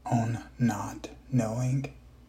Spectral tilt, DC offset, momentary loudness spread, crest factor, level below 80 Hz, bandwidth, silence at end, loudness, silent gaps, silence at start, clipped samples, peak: -7 dB/octave; under 0.1%; 10 LU; 16 dB; -54 dBFS; 15.5 kHz; 0.15 s; -31 LUFS; none; 0.05 s; under 0.1%; -14 dBFS